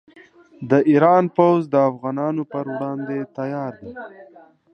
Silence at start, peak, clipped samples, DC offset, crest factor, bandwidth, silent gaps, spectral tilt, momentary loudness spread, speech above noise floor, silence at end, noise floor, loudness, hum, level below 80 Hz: 0.6 s; -2 dBFS; under 0.1%; under 0.1%; 18 dB; 6.4 kHz; none; -9.5 dB/octave; 21 LU; 30 dB; 0.5 s; -49 dBFS; -19 LUFS; none; -66 dBFS